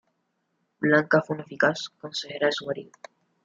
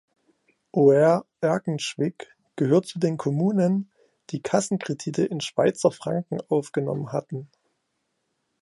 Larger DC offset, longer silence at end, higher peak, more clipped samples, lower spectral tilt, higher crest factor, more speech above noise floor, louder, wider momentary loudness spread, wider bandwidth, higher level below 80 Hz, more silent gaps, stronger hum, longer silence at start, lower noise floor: neither; second, 0.6 s vs 1.2 s; about the same, -6 dBFS vs -6 dBFS; neither; about the same, -5 dB/octave vs -6 dB/octave; about the same, 22 dB vs 20 dB; about the same, 50 dB vs 53 dB; about the same, -25 LUFS vs -24 LUFS; about the same, 13 LU vs 12 LU; second, 7.8 kHz vs 11.5 kHz; about the same, -74 dBFS vs -70 dBFS; neither; neither; about the same, 0.8 s vs 0.75 s; about the same, -75 dBFS vs -76 dBFS